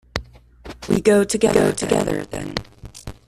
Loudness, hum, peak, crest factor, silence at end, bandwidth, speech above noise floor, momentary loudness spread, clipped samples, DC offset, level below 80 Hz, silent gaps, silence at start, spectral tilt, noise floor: -19 LUFS; none; -2 dBFS; 18 dB; 0.15 s; 14 kHz; 23 dB; 21 LU; under 0.1%; under 0.1%; -42 dBFS; none; 0.15 s; -5 dB/octave; -41 dBFS